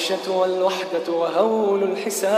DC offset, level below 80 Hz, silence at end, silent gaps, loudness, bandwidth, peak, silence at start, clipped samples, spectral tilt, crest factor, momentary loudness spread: under 0.1%; -80 dBFS; 0 s; none; -21 LUFS; 15 kHz; -6 dBFS; 0 s; under 0.1%; -3.5 dB/octave; 14 dB; 4 LU